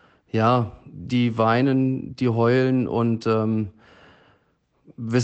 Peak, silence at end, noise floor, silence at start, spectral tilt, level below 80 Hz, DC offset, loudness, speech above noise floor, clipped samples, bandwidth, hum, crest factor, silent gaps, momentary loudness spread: -8 dBFS; 0 s; -66 dBFS; 0.35 s; -7.5 dB/octave; -58 dBFS; under 0.1%; -22 LUFS; 45 dB; under 0.1%; 8 kHz; none; 16 dB; none; 10 LU